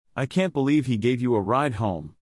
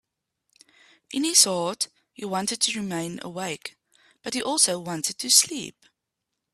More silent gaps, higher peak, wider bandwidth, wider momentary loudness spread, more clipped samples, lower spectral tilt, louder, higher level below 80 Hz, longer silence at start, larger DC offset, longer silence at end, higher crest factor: neither; second, -10 dBFS vs -2 dBFS; second, 12 kHz vs 15.5 kHz; second, 5 LU vs 18 LU; neither; first, -7.5 dB/octave vs -1.5 dB/octave; about the same, -24 LUFS vs -23 LUFS; first, -56 dBFS vs -72 dBFS; second, 0.15 s vs 1.1 s; neither; second, 0.1 s vs 0.85 s; second, 14 dB vs 24 dB